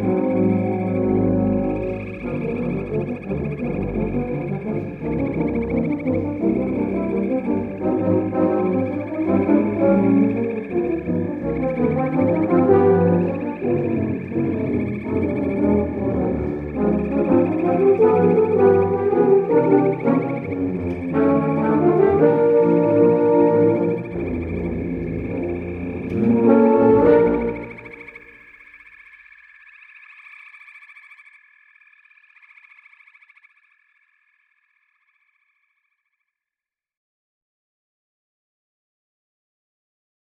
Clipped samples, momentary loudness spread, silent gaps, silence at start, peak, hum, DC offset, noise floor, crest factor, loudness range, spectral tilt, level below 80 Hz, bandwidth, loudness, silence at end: under 0.1%; 11 LU; none; 0 s; -2 dBFS; none; under 0.1%; under -90 dBFS; 18 dB; 7 LU; -11 dB/octave; -44 dBFS; 4.6 kHz; -19 LUFS; 9.45 s